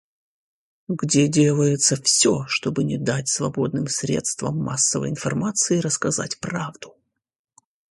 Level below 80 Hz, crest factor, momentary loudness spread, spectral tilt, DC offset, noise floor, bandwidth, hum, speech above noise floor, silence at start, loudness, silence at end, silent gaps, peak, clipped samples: -58 dBFS; 20 dB; 10 LU; -4 dB/octave; under 0.1%; -72 dBFS; 11.5 kHz; none; 50 dB; 0.9 s; -21 LUFS; 1 s; none; -4 dBFS; under 0.1%